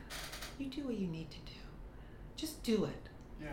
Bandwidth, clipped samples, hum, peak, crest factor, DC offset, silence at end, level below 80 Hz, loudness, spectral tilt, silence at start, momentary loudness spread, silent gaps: 19 kHz; under 0.1%; none; -22 dBFS; 20 dB; under 0.1%; 0 s; -54 dBFS; -41 LUFS; -5 dB/octave; 0 s; 18 LU; none